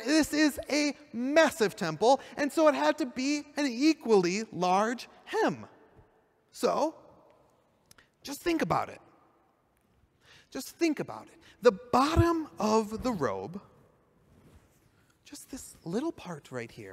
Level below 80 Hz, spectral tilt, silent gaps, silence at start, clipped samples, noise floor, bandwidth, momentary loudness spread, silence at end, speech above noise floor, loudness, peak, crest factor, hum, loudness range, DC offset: -56 dBFS; -5 dB/octave; none; 0 s; under 0.1%; -69 dBFS; 16 kHz; 18 LU; 0 s; 41 dB; -29 LUFS; -10 dBFS; 20 dB; none; 10 LU; under 0.1%